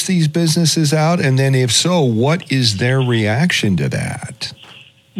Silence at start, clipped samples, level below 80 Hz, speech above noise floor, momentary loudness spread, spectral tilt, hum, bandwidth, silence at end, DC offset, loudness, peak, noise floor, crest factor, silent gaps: 0 s; under 0.1%; -56 dBFS; 28 dB; 11 LU; -4.5 dB/octave; none; 15 kHz; 0 s; under 0.1%; -15 LUFS; 0 dBFS; -43 dBFS; 16 dB; none